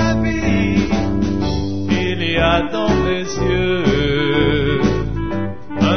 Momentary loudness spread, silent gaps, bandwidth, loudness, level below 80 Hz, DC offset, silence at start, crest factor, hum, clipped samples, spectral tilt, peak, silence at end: 6 LU; none; 6.6 kHz; -18 LUFS; -28 dBFS; 3%; 0 s; 14 dB; none; under 0.1%; -6.5 dB/octave; -2 dBFS; 0 s